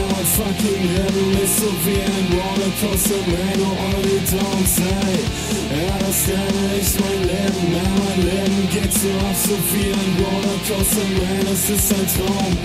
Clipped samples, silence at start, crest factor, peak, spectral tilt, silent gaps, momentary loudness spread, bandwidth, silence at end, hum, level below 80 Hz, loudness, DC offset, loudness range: under 0.1%; 0 s; 14 dB; -4 dBFS; -4.5 dB/octave; none; 3 LU; 16 kHz; 0 s; none; -32 dBFS; -18 LUFS; under 0.1%; 1 LU